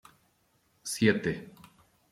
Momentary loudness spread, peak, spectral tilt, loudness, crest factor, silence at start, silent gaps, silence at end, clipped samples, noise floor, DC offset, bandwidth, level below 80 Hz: 18 LU; -10 dBFS; -5 dB/octave; -29 LUFS; 24 dB; 0.85 s; none; 0.65 s; under 0.1%; -70 dBFS; under 0.1%; 15.5 kHz; -64 dBFS